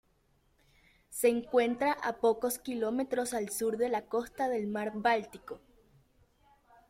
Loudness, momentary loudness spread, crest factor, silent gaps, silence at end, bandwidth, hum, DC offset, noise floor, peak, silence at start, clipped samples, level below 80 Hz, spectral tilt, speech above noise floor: -32 LUFS; 9 LU; 20 dB; none; 1.3 s; 16.5 kHz; none; under 0.1%; -70 dBFS; -14 dBFS; 1.1 s; under 0.1%; -68 dBFS; -4 dB/octave; 39 dB